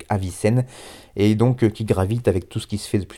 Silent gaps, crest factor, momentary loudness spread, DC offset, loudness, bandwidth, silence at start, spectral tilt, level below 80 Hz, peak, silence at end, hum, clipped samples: none; 16 dB; 12 LU; under 0.1%; -21 LUFS; 14 kHz; 0 s; -7 dB/octave; -46 dBFS; -4 dBFS; 0 s; none; under 0.1%